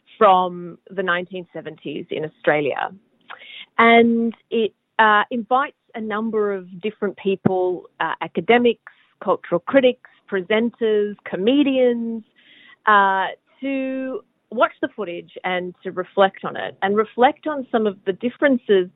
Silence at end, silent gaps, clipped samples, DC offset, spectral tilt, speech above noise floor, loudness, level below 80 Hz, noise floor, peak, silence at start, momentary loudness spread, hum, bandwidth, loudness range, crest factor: 0.05 s; none; under 0.1%; under 0.1%; -9.5 dB/octave; 30 dB; -20 LUFS; -76 dBFS; -50 dBFS; -2 dBFS; 0.2 s; 15 LU; none; 4.1 kHz; 5 LU; 20 dB